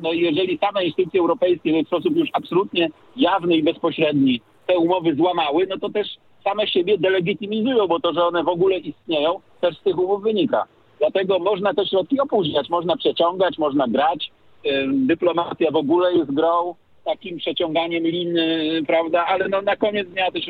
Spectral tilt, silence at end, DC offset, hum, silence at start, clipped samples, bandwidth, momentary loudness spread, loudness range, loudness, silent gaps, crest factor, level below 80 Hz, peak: -8 dB/octave; 0 s; under 0.1%; none; 0 s; under 0.1%; 4.7 kHz; 6 LU; 1 LU; -20 LUFS; none; 14 dB; -66 dBFS; -6 dBFS